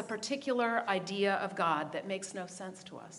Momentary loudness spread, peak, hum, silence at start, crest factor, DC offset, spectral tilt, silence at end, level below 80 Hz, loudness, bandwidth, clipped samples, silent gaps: 13 LU; -16 dBFS; none; 0 s; 18 dB; under 0.1%; -4 dB/octave; 0 s; -84 dBFS; -34 LUFS; 11.5 kHz; under 0.1%; none